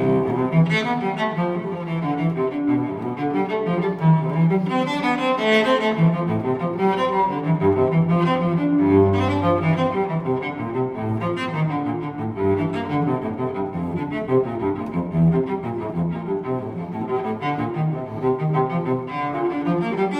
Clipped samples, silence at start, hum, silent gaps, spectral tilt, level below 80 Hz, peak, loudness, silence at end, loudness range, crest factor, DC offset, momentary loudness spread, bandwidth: under 0.1%; 0 s; none; none; -8 dB/octave; -52 dBFS; -6 dBFS; -22 LUFS; 0 s; 5 LU; 16 dB; under 0.1%; 8 LU; 8.6 kHz